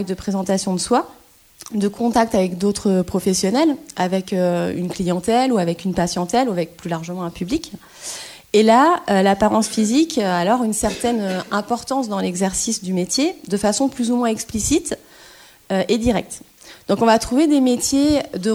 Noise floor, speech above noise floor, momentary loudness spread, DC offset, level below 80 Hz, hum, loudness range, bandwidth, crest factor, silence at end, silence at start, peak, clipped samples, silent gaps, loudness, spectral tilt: -46 dBFS; 27 dB; 10 LU; under 0.1%; -44 dBFS; none; 4 LU; 17 kHz; 18 dB; 0 s; 0 s; -2 dBFS; under 0.1%; none; -19 LUFS; -4.5 dB/octave